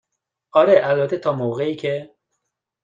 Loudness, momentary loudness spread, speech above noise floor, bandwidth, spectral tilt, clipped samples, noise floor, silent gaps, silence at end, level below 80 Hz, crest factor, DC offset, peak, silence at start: -19 LUFS; 11 LU; 59 dB; 7.6 kHz; -7.5 dB/octave; under 0.1%; -77 dBFS; none; 0.8 s; -66 dBFS; 18 dB; under 0.1%; -2 dBFS; 0.55 s